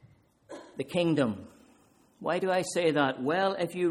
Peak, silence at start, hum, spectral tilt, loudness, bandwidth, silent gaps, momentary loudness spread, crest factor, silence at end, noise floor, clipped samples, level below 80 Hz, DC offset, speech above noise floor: -12 dBFS; 0.5 s; none; -5 dB/octave; -29 LUFS; 14 kHz; none; 16 LU; 18 dB; 0 s; -62 dBFS; under 0.1%; -70 dBFS; under 0.1%; 34 dB